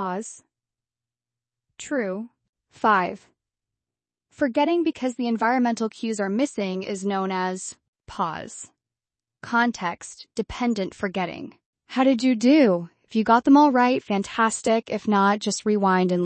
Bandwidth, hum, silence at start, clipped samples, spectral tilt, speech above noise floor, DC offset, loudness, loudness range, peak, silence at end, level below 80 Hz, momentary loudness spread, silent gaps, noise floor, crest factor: 8.8 kHz; none; 0 s; under 0.1%; -5 dB/octave; over 68 dB; under 0.1%; -23 LUFS; 9 LU; -6 dBFS; 0 s; -60 dBFS; 17 LU; 2.49-2.53 s, 7.88-7.93 s, 11.66-11.73 s; under -90 dBFS; 18 dB